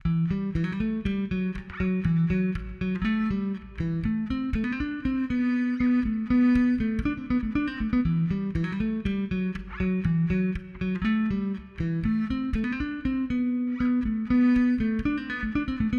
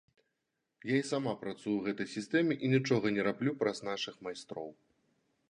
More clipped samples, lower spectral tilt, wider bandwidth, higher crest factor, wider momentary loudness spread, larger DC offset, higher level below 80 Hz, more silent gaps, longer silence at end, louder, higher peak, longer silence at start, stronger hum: neither; first, -9 dB/octave vs -6 dB/octave; second, 6.4 kHz vs 11 kHz; about the same, 14 dB vs 18 dB; second, 7 LU vs 14 LU; neither; first, -40 dBFS vs -76 dBFS; neither; second, 0 s vs 0.75 s; first, -27 LUFS vs -34 LUFS; first, -12 dBFS vs -16 dBFS; second, 0.05 s vs 0.85 s; neither